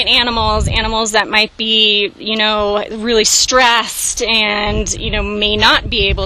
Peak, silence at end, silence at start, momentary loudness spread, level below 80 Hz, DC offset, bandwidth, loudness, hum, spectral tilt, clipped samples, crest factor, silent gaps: 0 dBFS; 0 s; 0 s; 8 LU; -26 dBFS; under 0.1%; 17 kHz; -12 LUFS; none; -2 dB/octave; 0.1%; 14 dB; none